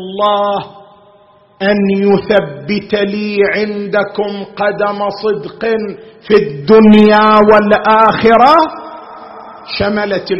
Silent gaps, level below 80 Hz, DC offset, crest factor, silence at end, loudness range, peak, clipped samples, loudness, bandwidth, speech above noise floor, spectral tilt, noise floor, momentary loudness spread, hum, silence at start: none; -44 dBFS; under 0.1%; 12 dB; 0 s; 7 LU; 0 dBFS; 0.3%; -11 LUFS; 6 kHz; 35 dB; -8 dB/octave; -46 dBFS; 18 LU; none; 0 s